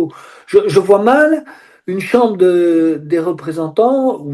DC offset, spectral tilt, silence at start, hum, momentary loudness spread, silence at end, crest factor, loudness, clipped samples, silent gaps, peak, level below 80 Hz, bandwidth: under 0.1%; -6.5 dB/octave; 0 s; none; 11 LU; 0 s; 14 dB; -13 LUFS; 0.3%; none; 0 dBFS; -60 dBFS; 12.5 kHz